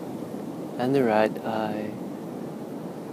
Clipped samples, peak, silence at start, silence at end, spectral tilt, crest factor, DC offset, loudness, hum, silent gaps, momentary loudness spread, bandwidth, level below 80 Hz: under 0.1%; -8 dBFS; 0 s; 0 s; -7 dB/octave; 20 dB; under 0.1%; -28 LUFS; none; none; 13 LU; 15.5 kHz; -72 dBFS